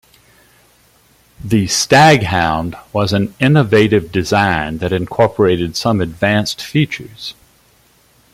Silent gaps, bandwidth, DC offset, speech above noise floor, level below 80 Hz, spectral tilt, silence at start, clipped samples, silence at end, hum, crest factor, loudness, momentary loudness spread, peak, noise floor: none; 16 kHz; under 0.1%; 38 dB; -44 dBFS; -5 dB/octave; 1.45 s; under 0.1%; 1 s; none; 16 dB; -14 LUFS; 11 LU; 0 dBFS; -52 dBFS